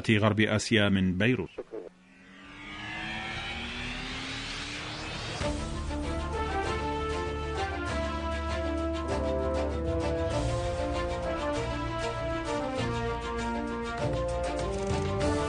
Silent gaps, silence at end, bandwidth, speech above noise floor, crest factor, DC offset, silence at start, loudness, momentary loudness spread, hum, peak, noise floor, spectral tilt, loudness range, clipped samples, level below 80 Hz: none; 0 s; 10.5 kHz; 28 dB; 22 dB; under 0.1%; 0 s; -31 LUFS; 10 LU; none; -8 dBFS; -54 dBFS; -5.5 dB/octave; 4 LU; under 0.1%; -40 dBFS